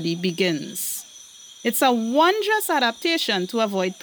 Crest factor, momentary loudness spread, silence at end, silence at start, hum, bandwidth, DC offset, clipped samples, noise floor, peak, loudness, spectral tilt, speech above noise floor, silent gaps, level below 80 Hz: 16 dB; 11 LU; 0 s; 0 s; none; over 20 kHz; under 0.1%; under 0.1%; -44 dBFS; -6 dBFS; -22 LUFS; -3.5 dB/octave; 23 dB; none; -78 dBFS